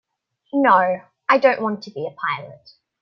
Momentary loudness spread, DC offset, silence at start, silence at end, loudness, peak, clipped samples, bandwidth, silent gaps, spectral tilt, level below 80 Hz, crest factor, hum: 13 LU; under 0.1%; 0.55 s; 0.45 s; -19 LUFS; -2 dBFS; under 0.1%; 6.4 kHz; none; -6.5 dB/octave; -72 dBFS; 20 dB; none